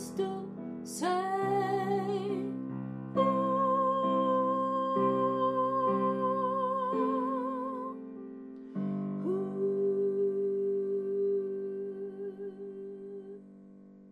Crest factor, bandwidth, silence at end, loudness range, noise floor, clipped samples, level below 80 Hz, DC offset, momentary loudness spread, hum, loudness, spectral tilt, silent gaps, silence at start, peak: 16 dB; 13.5 kHz; 0 s; 5 LU; -53 dBFS; under 0.1%; -78 dBFS; under 0.1%; 14 LU; none; -31 LUFS; -7 dB/octave; none; 0 s; -16 dBFS